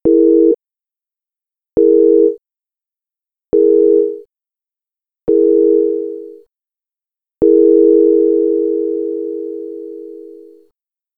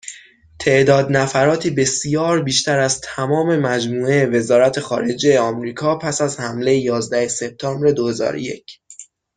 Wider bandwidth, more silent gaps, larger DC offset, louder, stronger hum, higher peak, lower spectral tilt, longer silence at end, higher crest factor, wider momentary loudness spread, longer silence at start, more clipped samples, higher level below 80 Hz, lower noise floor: second, 1.5 kHz vs 10 kHz; neither; neither; first, -12 LUFS vs -17 LUFS; neither; about the same, 0 dBFS vs -2 dBFS; first, -12 dB/octave vs -4.5 dB/octave; first, 0.85 s vs 0.35 s; about the same, 14 dB vs 16 dB; first, 19 LU vs 8 LU; about the same, 0.05 s vs 0.05 s; neither; about the same, -50 dBFS vs -54 dBFS; first, -90 dBFS vs -43 dBFS